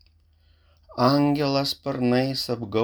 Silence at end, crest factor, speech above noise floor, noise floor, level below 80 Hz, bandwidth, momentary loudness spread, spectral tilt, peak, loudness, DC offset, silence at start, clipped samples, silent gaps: 0 s; 18 dB; 37 dB; -60 dBFS; -58 dBFS; over 20 kHz; 7 LU; -6 dB/octave; -6 dBFS; -23 LUFS; under 0.1%; 0.9 s; under 0.1%; none